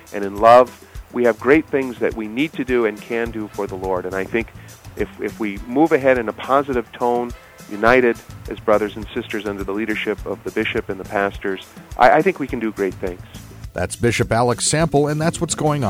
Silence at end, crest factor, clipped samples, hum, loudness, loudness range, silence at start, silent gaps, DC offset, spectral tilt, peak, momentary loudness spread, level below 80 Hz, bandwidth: 0 s; 18 dB; under 0.1%; none; -19 LUFS; 5 LU; 0.1 s; none; under 0.1%; -5 dB/octave; 0 dBFS; 15 LU; -42 dBFS; 16.5 kHz